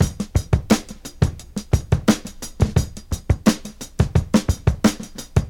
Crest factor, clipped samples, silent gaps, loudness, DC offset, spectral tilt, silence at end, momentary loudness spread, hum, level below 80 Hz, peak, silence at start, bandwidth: 20 dB; under 0.1%; none; -21 LUFS; under 0.1%; -6 dB/octave; 0 s; 12 LU; none; -28 dBFS; 0 dBFS; 0 s; 18 kHz